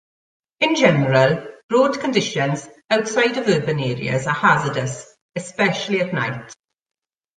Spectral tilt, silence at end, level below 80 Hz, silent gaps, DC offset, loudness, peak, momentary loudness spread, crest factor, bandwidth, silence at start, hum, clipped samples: -5 dB/octave; 0.85 s; -58 dBFS; 1.64-1.69 s, 5.21-5.29 s; under 0.1%; -19 LUFS; -2 dBFS; 13 LU; 18 dB; 9.6 kHz; 0.6 s; none; under 0.1%